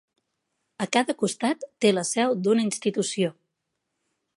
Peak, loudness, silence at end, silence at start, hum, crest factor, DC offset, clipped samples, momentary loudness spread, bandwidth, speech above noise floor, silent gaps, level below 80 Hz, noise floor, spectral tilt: -6 dBFS; -25 LUFS; 1.05 s; 0.8 s; none; 20 dB; under 0.1%; under 0.1%; 6 LU; 11.5 kHz; 56 dB; none; -76 dBFS; -80 dBFS; -4 dB/octave